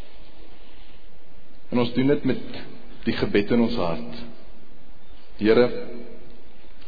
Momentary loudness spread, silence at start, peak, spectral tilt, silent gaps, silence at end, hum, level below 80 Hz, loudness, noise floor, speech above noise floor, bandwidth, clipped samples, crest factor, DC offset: 21 LU; 0 s; -6 dBFS; -8.5 dB/octave; none; 0 s; none; -46 dBFS; -23 LUFS; -50 dBFS; 27 dB; 5 kHz; under 0.1%; 20 dB; 6%